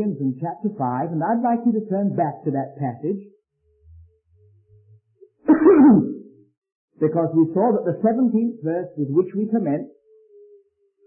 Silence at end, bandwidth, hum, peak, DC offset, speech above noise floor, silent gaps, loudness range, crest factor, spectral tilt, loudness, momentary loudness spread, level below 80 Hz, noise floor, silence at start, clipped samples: 1.2 s; 2.8 kHz; none; -4 dBFS; under 0.1%; 42 dB; 6.57-6.62 s, 6.72-6.88 s; 9 LU; 16 dB; -15 dB/octave; -20 LUFS; 14 LU; -62 dBFS; -63 dBFS; 0 s; under 0.1%